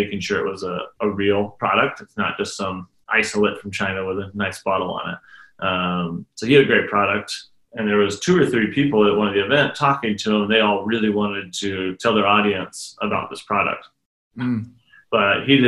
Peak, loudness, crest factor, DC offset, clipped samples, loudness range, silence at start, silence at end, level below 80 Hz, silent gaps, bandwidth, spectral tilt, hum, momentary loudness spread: -2 dBFS; -20 LUFS; 18 dB; under 0.1%; under 0.1%; 5 LU; 0 s; 0 s; -58 dBFS; 14.06-14.31 s; 12 kHz; -5 dB/octave; none; 11 LU